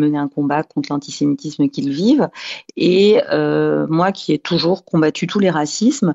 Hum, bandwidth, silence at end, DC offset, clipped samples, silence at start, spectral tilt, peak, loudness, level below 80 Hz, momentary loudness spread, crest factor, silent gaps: none; 8 kHz; 0 s; under 0.1%; under 0.1%; 0 s; -5.5 dB/octave; -2 dBFS; -17 LUFS; -60 dBFS; 8 LU; 14 dB; none